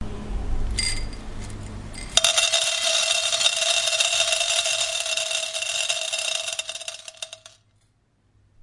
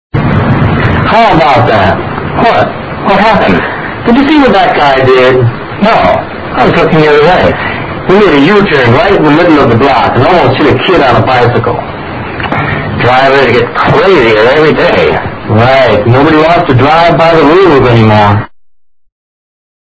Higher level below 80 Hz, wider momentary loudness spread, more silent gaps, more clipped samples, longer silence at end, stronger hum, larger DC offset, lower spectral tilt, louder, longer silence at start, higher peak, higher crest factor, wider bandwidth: second, -36 dBFS vs -28 dBFS; first, 18 LU vs 9 LU; neither; second, under 0.1% vs 4%; second, 1.15 s vs 1.55 s; neither; neither; second, 0 dB/octave vs -7.5 dB/octave; second, -21 LUFS vs -6 LUFS; second, 0 s vs 0.15 s; about the same, 0 dBFS vs 0 dBFS; first, 26 dB vs 6 dB; first, 12 kHz vs 8 kHz